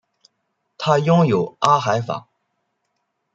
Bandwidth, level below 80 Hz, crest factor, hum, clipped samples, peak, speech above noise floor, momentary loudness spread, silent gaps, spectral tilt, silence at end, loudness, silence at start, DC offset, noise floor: 7.8 kHz; -64 dBFS; 20 dB; none; under 0.1%; -2 dBFS; 56 dB; 11 LU; none; -6.5 dB/octave; 1.15 s; -18 LUFS; 0.8 s; under 0.1%; -73 dBFS